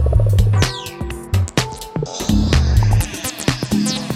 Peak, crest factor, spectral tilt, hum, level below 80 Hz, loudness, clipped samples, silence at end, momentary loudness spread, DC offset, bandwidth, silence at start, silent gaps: -2 dBFS; 16 dB; -5.5 dB/octave; none; -22 dBFS; -18 LUFS; under 0.1%; 0 s; 10 LU; under 0.1%; 15.5 kHz; 0 s; none